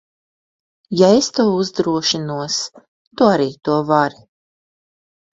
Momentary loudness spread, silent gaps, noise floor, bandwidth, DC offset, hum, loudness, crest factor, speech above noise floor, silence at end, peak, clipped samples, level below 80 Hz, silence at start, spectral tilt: 9 LU; 2.88-3.11 s; under -90 dBFS; 8 kHz; under 0.1%; none; -17 LUFS; 18 dB; over 74 dB; 1.25 s; 0 dBFS; under 0.1%; -60 dBFS; 0.9 s; -4.5 dB/octave